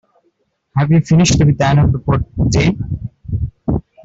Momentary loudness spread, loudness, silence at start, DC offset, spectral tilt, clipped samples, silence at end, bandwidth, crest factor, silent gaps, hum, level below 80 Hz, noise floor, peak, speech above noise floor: 12 LU; -15 LUFS; 0.75 s; under 0.1%; -6 dB/octave; under 0.1%; 0.25 s; 8 kHz; 12 dB; none; none; -30 dBFS; -63 dBFS; -2 dBFS; 50 dB